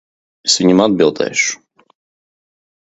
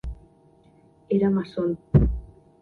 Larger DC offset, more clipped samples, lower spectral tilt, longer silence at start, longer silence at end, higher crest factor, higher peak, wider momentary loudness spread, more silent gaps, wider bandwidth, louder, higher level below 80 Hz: neither; neither; second, -3.5 dB/octave vs -11 dB/octave; first, 0.45 s vs 0.05 s; first, 1.45 s vs 0.35 s; about the same, 18 dB vs 22 dB; first, 0 dBFS vs -4 dBFS; second, 9 LU vs 12 LU; neither; first, 8.2 kHz vs 4.7 kHz; first, -14 LUFS vs -24 LUFS; second, -56 dBFS vs -34 dBFS